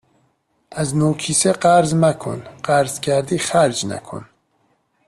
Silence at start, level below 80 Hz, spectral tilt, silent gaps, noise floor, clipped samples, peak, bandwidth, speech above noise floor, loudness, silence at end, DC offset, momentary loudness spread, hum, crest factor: 0.7 s; -54 dBFS; -4.5 dB/octave; none; -64 dBFS; under 0.1%; -2 dBFS; 13.5 kHz; 46 dB; -18 LUFS; 0.85 s; under 0.1%; 15 LU; none; 18 dB